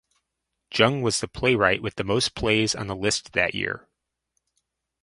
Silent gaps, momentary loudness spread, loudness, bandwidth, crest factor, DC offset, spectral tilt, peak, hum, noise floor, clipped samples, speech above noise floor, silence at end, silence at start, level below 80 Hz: none; 8 LU; -23 LUFS; 11.5 kHz; 24 dB; under 0.1%; -3.5 dB/octave; -2 dBFS; none; -81 dBFS; under 0.1%; 57 dB; 1.25 s; 0.7 s; -50 dBFS